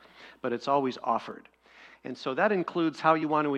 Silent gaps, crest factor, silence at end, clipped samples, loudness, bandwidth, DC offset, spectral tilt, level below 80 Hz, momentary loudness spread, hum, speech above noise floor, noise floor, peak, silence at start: none; 22 dB; 0 s; under 0.1%; -28 LUFS; 9 kHz; under 0.1%; -6.5 dB/octave; -76 dBFS; 17 LU; none; 27 dB; -55 dBFS; -8 dBFS; 0.2 s